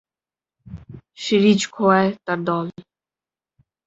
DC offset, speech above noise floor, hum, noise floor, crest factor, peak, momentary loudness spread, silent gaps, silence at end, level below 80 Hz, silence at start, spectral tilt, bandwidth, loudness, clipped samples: under 0.1%; over 72 dB; none; under -90 dBFS; 20 dB; -2 dBFS; 23 LU; none; 1.05 s; -56 dBFS; 0.7 s; -5.5 dB/octave; 8 kHz; -19 LUFS; under 0.1%